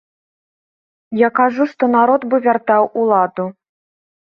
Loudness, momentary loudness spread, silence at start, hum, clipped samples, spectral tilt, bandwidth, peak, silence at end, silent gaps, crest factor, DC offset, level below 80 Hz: -15 LUFS; 9 LU; 1.1 s; none; under 0.1%; -8.5 dB/octave; 6.2 kHz; 0 dBFS; 0.7 s; none; 16 dB; under 0.1%; -66 dBFS